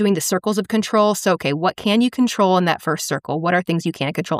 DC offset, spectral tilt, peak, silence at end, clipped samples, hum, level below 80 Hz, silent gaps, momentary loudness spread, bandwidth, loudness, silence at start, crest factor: under 0.1%; -4.5 dB/octave; -4 dBFS; 0 s; under 0.1%; none; -62 dBFS; none; 6 LU; 15.5 kHz; -19 LUFS; 0 s; 14 dB